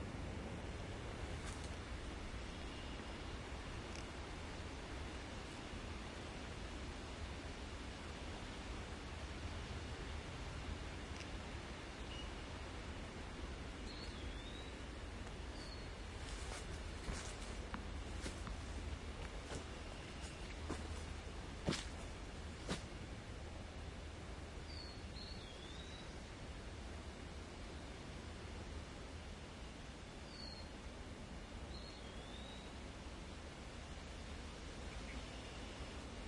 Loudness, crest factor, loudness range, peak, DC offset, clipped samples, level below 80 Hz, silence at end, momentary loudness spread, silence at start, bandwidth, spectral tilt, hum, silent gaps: -50 LUFS; 24 dB; 4 LU; -24 dBFS; under 0.1%; under 0.1%; -52 dBFS; 0 s; 4 LU; 0 s; 11.5 kHz; -4.5 dB/octave; none; none